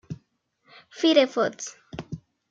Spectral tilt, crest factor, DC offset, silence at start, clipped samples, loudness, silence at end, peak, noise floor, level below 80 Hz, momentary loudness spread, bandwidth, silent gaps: -4 dB/octave; 22 dB; under 0.1%; 0.1 s; under 0.1%; -22 LUFS; 0.35 s; -4 dBFS; -69 dBFS; -62 dBFS; 22 LU; 7.8 kHz; none